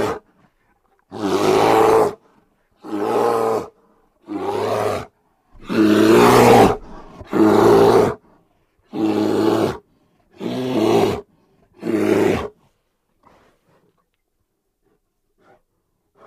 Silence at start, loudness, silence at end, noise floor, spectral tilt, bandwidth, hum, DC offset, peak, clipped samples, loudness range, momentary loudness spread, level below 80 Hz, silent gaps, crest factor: 0 s; -16 LUFS; 3.8 s; -71 dBFS; -6 dB/octave; 15.5 kHz; none; under 0.1%; 0 dBFS; under 0.1%; 10 LU; 19 LU; -46 dBFS; none; 18 dB